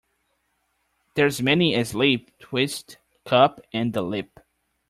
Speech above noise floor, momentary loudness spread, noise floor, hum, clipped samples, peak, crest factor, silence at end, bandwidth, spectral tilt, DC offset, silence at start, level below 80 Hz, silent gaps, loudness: 49 dB; 12 LU; -72 dBFS; none; under 0.1%; -4 dBFS; 22 dB; 0.65 s; 15.5 kHz; -5 dB/octave; under 0.1%; 1.15 s; -60 dBFS; none; -22 LUFS